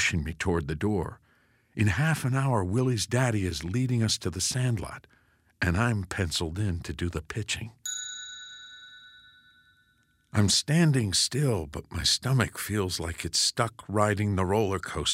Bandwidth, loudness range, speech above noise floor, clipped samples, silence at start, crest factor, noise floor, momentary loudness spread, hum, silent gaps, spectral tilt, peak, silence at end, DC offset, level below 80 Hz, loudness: 16 kHz; 8 LU; 40 dB; under 0.1%; 0 s; 22 dB; -67 dBFS; 13 LU; none; none; -4 dB/octave; -6 dBFS; 0 s; under 0.1%; -48 dBFS; -27 LUFS